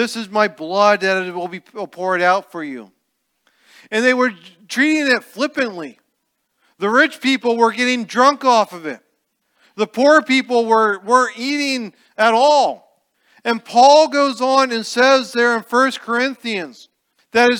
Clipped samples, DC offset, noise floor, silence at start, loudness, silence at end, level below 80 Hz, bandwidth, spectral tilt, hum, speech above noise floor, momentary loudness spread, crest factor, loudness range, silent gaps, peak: under 0.1%; under 0.1%; -71 dBFS; 0 s; -16 LUFS; 0 s; -72 dBFS; 17.5 kHz; -3 dB/octave; none; 55 dB; 15 LU; 16 dB; 5 LU; none; 0 dBFS